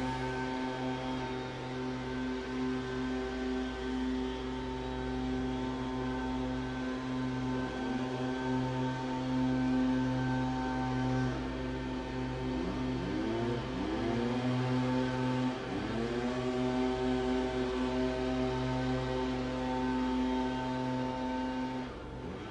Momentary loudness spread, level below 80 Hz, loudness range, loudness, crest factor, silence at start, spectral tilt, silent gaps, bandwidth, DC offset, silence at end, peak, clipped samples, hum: 5 LU; -48 dBFS; 3 LU; -34 LUFS; 14 dB; 0 s; -6.5 dB/octave; none; 10 kHz; under 0.1%; 0 s; -20 dBFS; under 0.1%; none